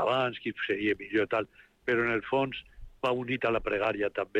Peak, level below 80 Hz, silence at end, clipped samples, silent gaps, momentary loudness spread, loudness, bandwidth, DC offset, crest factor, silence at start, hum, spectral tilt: -16 dBFS; -54 dBFS; 0 s; under 0.1%; none; 6 LU; -30 LUFS; 9.6 kHz; under 0.1%; 14 dB; 0 s; none; -6.5 dB/octave